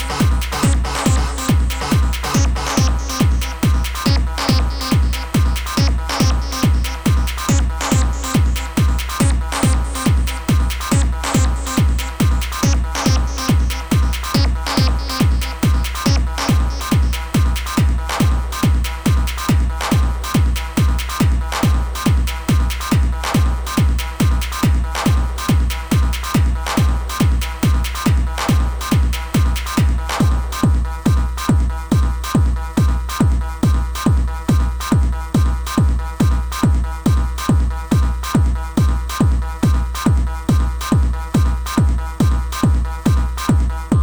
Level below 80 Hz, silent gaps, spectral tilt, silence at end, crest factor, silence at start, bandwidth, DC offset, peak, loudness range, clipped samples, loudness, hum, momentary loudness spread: -18 dBFS; none; -5.5 dB/octave; 0 s; 12 dB; 0 s; over 20 kHz; under 0.1%; -4 dBFS; 0 LU; under 0.1%; -18 LUFS; none; 1 LU